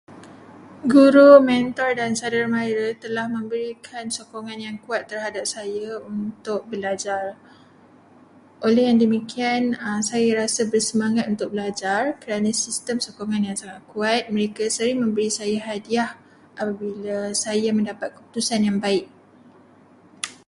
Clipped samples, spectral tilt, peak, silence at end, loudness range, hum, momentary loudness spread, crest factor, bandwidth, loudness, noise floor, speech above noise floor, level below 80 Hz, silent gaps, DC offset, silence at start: under 0.1%; -4 dB/octave; 0 dBFS; 0.15 s; 11 LU; none; 12 LU; 22 dB; 11.5 kHz; -21 LUFS; -52 dBFS; 31 dB; -66 dBFS; none; under 0.1%; 0.1 s